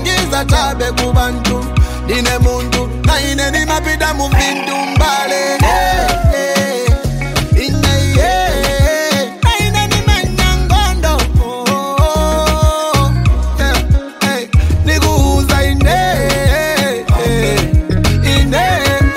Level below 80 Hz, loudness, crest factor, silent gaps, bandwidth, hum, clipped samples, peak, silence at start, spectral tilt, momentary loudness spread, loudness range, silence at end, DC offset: -16 dBFS; -13 LUFS; 12 dB; none; 16.5 kHz; none; under 0.1%; 0 dBFS; 0 s; -4.5 dB/octave; 3 LU; 1 LU; 0 s; under 0.1%